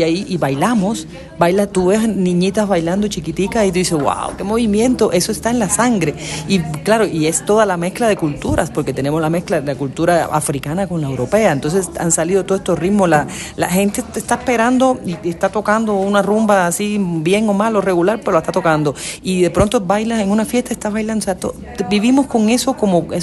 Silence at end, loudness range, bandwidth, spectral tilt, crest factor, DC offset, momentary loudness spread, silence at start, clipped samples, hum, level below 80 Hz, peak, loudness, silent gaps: 0 s; 2 LU; 13 kHz; -5 dB/octave; 16 dB; under 0.1%; 6 LU; 0 s; under 0.1%; none; -40 dBFS; 0 dBFS; -16 LUFS; none